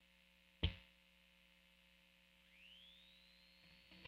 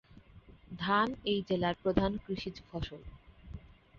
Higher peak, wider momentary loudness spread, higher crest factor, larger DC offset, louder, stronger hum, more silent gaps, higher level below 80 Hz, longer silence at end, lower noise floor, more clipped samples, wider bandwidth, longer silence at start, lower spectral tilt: second, -24 dBFS vs -14 dBFS; first, 24 LU vs 21 LU; first, 32 dB vs 22 dB; neither; second, -50 LUFS vs -34 LUFS; first, 60 Hz at -75 dBFS vs none; neither; second, -58 dBFS vs -52 dBFS; about the same, 0 s vs 0 s; first, -72 dBFS vs -57 dBFS; neither; first, 15.5 kHz vs 7 kHz; about the same, 0 s vs 0.1 s; first, -6 dB/octave vs -4 dB/octave